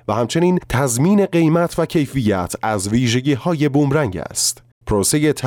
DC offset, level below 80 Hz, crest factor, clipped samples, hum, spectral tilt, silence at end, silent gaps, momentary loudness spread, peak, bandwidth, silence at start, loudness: under 0.1%; -40 dBFS; 12 dB; under 0.1%; none; -5 dB/octave; 0 s; 4.72-4.81 s; 5 LU; -6 dBFS; 18.5 kHz; 0.1 s; -17 LUFS